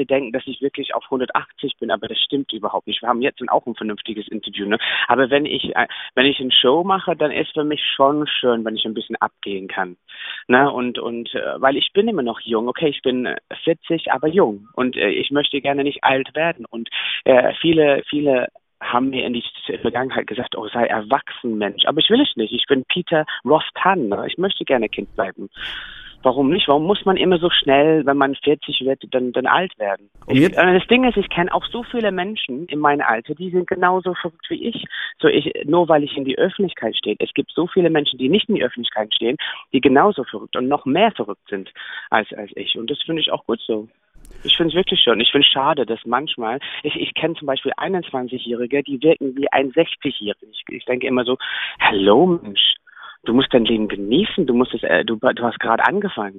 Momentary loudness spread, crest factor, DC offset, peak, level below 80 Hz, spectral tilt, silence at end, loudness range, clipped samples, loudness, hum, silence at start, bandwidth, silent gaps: 11 LU; 18 dB; under 0.1%; 0 dBFS; -52 dBFS; -7 dB/octave; 0 s; 4 LU; under 0.1%; -19 LUFS; none; 0 s; 6.6 kHz; none